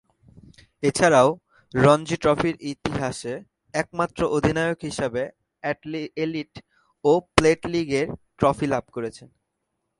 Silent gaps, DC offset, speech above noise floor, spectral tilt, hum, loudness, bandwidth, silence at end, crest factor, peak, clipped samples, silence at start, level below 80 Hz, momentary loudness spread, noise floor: none; under 0.1%; 56 dB; -5.5 dB/octave; none; -23 LUFS; 11.5 kHz; 0.75 s; 24 dB; 0 dBFS; under 0.1%; 0.8 s; -48 dBFS; 15 LU; -78 dBFS